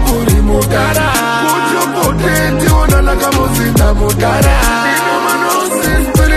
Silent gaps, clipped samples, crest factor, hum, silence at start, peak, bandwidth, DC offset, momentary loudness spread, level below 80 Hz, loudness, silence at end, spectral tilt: none; under 0.1%; 10 dB; none; 0 s; 0 dBFS; 14.5 kHz; under 0.1%; 2 LU; -16 dBFS; -11 LUFS; 0 s; -4.5 dB/octave